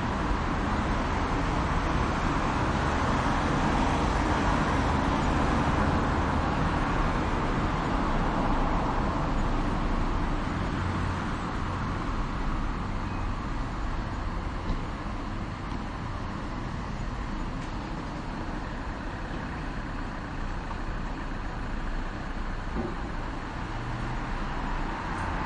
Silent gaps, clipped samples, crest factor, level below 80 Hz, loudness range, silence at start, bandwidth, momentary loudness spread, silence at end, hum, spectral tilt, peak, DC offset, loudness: none; under 0.1%; 16 dB; -34 dBFS; 9 LU; 0 s; 10 kHz; 9 LU; 0 s; none; -6.5 dB/octave; -12 dBFS; under 0.1%; -30 LUFS